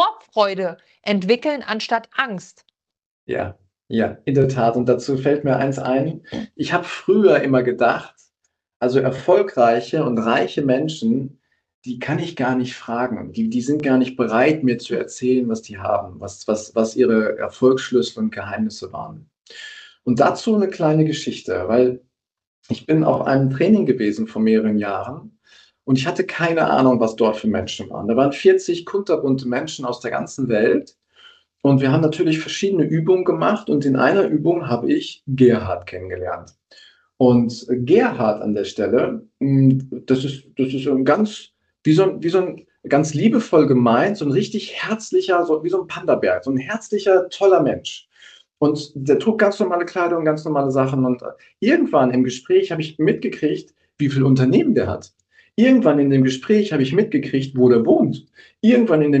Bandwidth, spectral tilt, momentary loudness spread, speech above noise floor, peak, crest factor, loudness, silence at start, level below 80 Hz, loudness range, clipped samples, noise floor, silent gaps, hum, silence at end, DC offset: 8.6 kHz; -6.5 dB/octave; 11 LU; 53 dB; -2 dBFS; 16 dB; -19 LUFS; 0 s; -60 dBFS; 4 LU; under 0.1%; -71 dBFS; 3.06-3.27 s, 8.76-8.80 s, 11.74-11.82 s, 22.47-22.63 s; none; 0 s; under 0.1%